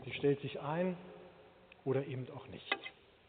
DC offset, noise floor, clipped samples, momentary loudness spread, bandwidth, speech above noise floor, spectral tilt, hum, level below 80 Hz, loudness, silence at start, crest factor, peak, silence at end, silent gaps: under 0.1%; -61 dBFS; under 0.1%; 17 LU; 4.6 kHz; 23 dB; -5 dB/octave; none; -74 dBFS; -39 LUFS; 0 s; 22 dB; -18 dBFS; 0.35 s; none